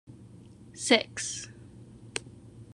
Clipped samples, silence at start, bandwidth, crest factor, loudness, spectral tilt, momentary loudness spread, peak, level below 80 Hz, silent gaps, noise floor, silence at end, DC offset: under 0.1%; 0.1 s; 12.5 kHz; 28 dB; -29 LUFS; -2.5 dB/octave; 26 LU; -6 dBFS; -62 dBFS; none; -51 dBFS; 0 s; under 0.1%